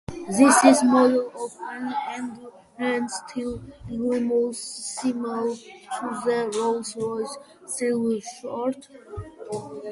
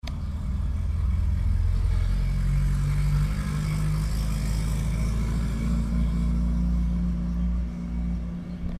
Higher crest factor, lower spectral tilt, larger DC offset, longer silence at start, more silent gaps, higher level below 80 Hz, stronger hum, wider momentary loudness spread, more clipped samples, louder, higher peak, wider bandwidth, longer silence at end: first, 22 dB vs 10 dB; second, -4 dB/octave vs -7 dB/octave; neither; about the same, 0.1 s vs 0.05 s; neither; second, -56 dBFS vs -26 dBFS; neither; first, 19 LU vs 5 LU; neither; first, -24 LUFS vs -27 LUFS; first, -2 dBFS vs -14 dBFS; second, 11.5 kHz vs 13 kHz; about the same, 0 s vs 0 s